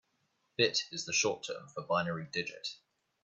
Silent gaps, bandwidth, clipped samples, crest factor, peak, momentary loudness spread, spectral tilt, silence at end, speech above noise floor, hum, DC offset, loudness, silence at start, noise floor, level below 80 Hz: none; 8.4 kHz; under 0.1%; 22 dB; -14 dBFS; 13 LU; -2.5 dB/octave; 0.5 s; 43 dB; none; under 0.1%; -34 LUFS; 0.6 s; -78 dBFS; -78 dBFS